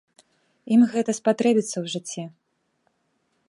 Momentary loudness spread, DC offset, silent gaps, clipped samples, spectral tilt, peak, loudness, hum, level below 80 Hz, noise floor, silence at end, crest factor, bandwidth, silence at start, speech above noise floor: 15 LU; under 0.1%; none; under 0.1%; -5 dB/octave; -8 dBFS; -22 LUFS; none; -76 dBFS; -71 dBFS; 1.2 s; 18 dB; 11.5 kHz; 0.65 s; 49 dB